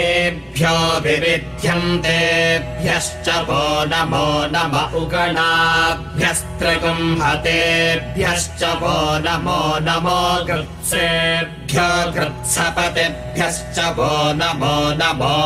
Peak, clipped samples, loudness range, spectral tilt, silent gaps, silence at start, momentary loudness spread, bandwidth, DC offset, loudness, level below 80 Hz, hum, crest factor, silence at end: -4 dBFS; under 0.1%; 2 LU; -3.5 dB/octave; none; 0 s; 5 LU; 16 kHz; under 0.1%; -17 LUFS; -36 dBFS; none; 14 dB; 0 s